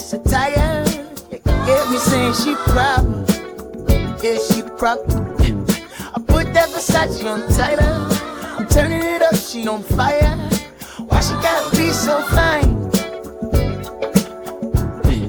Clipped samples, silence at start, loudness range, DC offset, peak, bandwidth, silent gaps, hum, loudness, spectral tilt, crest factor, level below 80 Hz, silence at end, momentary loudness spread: under 0.1%; 0 s; 1 LU; under 0.1%; 0 dBFS; over 20 kHz; none; none; -18 LUFS; -5 dB/octave; 16 dB; -24 dBFS; 0 s; 9 LU